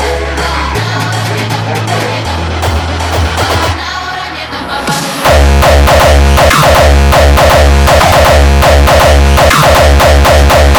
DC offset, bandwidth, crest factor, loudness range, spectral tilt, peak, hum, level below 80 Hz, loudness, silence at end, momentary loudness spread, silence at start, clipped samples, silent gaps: under 0.1%; over 20 kHz; 6 dB; 8 LU; -4.5 dB/octave; 0 dBFS; none; -12 dBFS; -7 LUFS; 0 s; 9 LU; 0 s; 0.3%; none